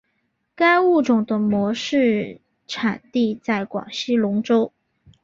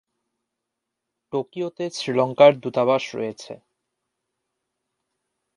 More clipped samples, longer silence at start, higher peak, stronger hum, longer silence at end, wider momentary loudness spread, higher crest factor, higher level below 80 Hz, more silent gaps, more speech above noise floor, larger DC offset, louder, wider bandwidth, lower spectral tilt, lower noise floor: neither; second, 0.6 s vs 1.35 s; about the same, -4 dBFS vs -2 dBFS; neither; second, 0.55 s vs 2 s; second, 10 LU vs 15 LU; second, 16 dB vs 24 dB; first, -62 dBFS vs -74 dBFS; neither; second, 52 dB vs 62 dB; neither; about the same, -20 LUFS vs -21 LUFS; second, 7.6 kHz vs 11 kHz; about the same, -5.5 dB/octave vs -5.5 dB/octave; second, -71 dBFS vs -82 dBFS